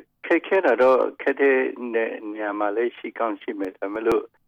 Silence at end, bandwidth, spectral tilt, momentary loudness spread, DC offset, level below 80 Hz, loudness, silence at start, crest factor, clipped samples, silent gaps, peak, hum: 0.2 s; 7.8 kHz; -6 dB/octave; 11 LU; under 0.1%; -64 dBFS; -23 LUFS; 0.25 s; 14 dB; under 0.1%; none; -10 dBFS; none